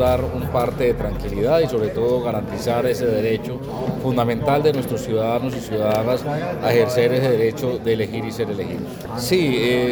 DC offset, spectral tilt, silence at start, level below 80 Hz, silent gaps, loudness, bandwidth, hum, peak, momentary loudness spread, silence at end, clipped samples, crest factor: under 0.1%; -6.5 dB/octave; 0 s; -40 dBFS; none; -21 LUFS; over 20 kHz; none; -2 dBFS; 7 LU; 0 s; under 0.1%; 18 dB